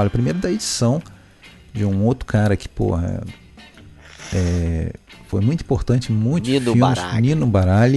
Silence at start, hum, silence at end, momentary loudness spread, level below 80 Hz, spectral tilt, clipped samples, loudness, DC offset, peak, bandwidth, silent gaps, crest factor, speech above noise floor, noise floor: 0 s; none; 0 s; 10 LU; -36 dBFS; -6.5 dB/octave; under 0.1%; -20 LUFS; under 0.1%; 0 dBFS; 12.5 kHz; none; 18 dB; 27 dB; -45 dBFS